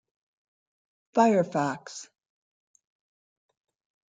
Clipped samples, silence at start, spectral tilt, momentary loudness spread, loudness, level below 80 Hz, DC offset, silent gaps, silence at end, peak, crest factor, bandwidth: under 0.1%; 1.15 s; -6 dB/octave; 19 LU; -25 LUFS; -78 dBFS; under 0.1%; none; 2.05 s; -8 dBFS; 24 dB; 9.4 kHz